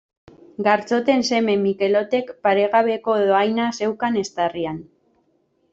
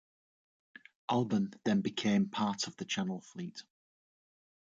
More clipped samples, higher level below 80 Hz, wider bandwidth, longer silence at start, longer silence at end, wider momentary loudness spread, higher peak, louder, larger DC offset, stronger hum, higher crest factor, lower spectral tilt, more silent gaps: neither; first, -64 dBFS vs -76 dBFS; about the same, 7.8 kHz vs 7.8 kHz; second, 0.6 s vs 1.1 s; second, 0.9 s vs 1.1 s; second, 6 LU vs 13 LU; first, -4 dBFS vs -20 dBFS; first, -20 LUFS vs -34 LUFS; neither; neither; about the same, 18 dB vs 16 dB; about the same, -5 dB/octave vs -5 dB/octave; neither